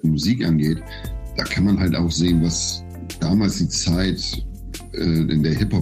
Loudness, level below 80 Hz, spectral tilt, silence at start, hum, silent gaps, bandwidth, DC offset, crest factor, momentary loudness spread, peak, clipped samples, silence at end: -20 LUFS; -34 dBFS; -5 dB/octave; 0.05 s; none; none; 15.5 kHz; under 0.1%; 12 dB; 13 LU; -8 dBFS; under 0.1%; 0 s